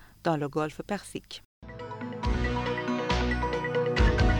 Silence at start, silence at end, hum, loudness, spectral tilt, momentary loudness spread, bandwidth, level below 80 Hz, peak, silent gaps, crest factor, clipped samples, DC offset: 0 s; 0 s; none; -29 LUFS; -6 dB/octave; 16 LU; 11.5 kHz; -34 dBFS; -10 dBFS; 1.45-1.62 s; 18 dB; under 0.1%; under 0.1%